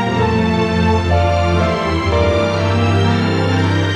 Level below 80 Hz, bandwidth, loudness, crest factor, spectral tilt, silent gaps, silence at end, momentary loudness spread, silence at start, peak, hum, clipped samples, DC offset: -34 dBFS; 9.8 kHz; -15 LUFS; 12 dB; -7 dB/octave; none; 0 s; 1 LU; 0 s; -2 dBFS; none; under 0.1%; under 0.1%